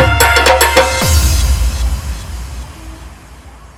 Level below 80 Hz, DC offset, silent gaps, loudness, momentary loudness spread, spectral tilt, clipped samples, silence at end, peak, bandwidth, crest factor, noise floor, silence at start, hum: -18 dBFS; under 0.1%; none; -11 LUFS; 21 LU; -3.5 dB/octave; 0.2%; 0.05 s; 0 dBFS; over 20 kHz; 12 dB; -35 dBFS; 0 s; none